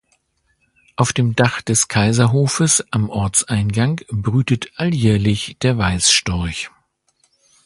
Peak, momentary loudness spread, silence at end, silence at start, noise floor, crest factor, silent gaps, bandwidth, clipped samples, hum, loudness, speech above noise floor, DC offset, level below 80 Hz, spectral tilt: 0 dBFS; 8 LU; 1 s; 1 s; -65 dBFS; 18 dB; none; 11.5 kHz; under 0.1%; none; -17 LUFS; 48 dB; under 0.1%; -38 dBFS; -4 dB/octave